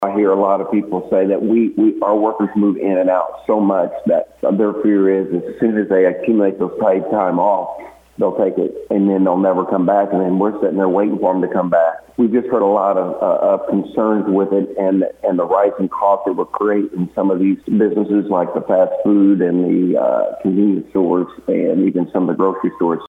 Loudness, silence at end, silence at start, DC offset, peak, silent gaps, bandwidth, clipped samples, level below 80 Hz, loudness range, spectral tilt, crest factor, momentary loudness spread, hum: -16 LUFS; 0 s; 0 s; under 0.1%; -2 dBFS; none; 3.8 kHz; under 0.1%; -60 dBFS; 1 LU; -10 dB/octave; 14 dB; 4 LU; none